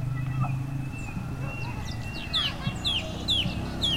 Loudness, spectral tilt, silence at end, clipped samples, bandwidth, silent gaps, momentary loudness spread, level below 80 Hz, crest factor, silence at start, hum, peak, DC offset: -29 LUFS; -4.5 dB/octave; 0 s; under 0.1%; 16 kHz; none; 9 LU; -40 dBFS; 14 dB; 0 s; none; -14 dBFS; under 0.1%